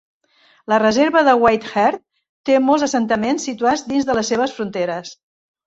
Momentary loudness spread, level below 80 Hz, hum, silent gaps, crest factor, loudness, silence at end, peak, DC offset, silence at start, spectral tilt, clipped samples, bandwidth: 12 LU; -56 dBFS; none; 2.29-2.44 s; 16 dB; -17 LUFS; 0.55 s; -2 dBFS; under 0.1%; 0.7 s; -4 dB/octave; under 0.1%; 8 kHz